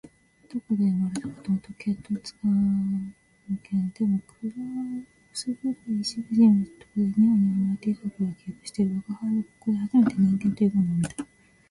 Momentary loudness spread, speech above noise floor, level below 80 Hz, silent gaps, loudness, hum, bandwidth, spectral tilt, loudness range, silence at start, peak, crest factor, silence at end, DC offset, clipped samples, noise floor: 14 LU; 28 dB; -60 dBFS; none; -26 LUFS; none; 11.5 kHz; -7 dB/octave; 5 LU; 0.05 s; -10 dBFS; 16 dB; 0.45 s; under 0.1%; under 0.1%; -53 dBFS